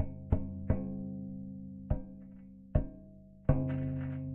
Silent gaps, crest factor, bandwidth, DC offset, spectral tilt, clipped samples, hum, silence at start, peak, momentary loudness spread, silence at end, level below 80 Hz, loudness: none; 24 dB; 3.2 kHz; under 0.1%; -12.5 dB/octave; under 0.1%; none; 0 s; -12 dBFS; 18 LU; 0 s; -42 dBFS; -37 LUFS